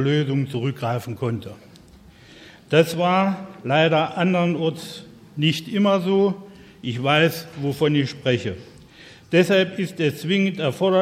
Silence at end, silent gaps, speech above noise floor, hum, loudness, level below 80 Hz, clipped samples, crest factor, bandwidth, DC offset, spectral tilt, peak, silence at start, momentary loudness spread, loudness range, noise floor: 0 s; none; 27 dB; none; -21 LUFS; -60 dBFS; under 0.1%; 20 dB; 16 kHz; under 0.1%; -6 dB/octave; -2 dBFS; 0 s; 13 LU; 3 LU; -48 dBFS